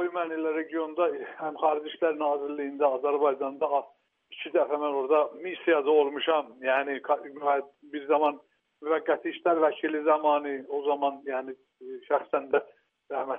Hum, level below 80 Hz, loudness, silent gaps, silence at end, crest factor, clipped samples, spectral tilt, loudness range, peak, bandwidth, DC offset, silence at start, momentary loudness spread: none; -88 dBFS; -28 LUFS; none; 0 s; 18 dB; under 0.1%; -1 dB/octave; 2 LU; -10 dBFS; 3.7 kHz; under 0.1%; 0 s; 10 LU